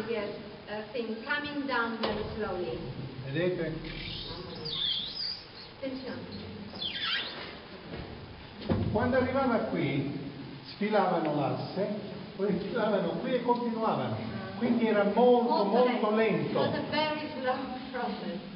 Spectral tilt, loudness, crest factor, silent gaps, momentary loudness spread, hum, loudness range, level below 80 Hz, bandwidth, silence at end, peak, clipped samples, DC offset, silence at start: -4 dB/octave; -31 LUFS; 18 dB; none; 15 LU; none; 8 LU; -56 dBFS; 5.8 kHz; 0 s; -12 dBFS; under 0.1%; under 0.1%; 0 s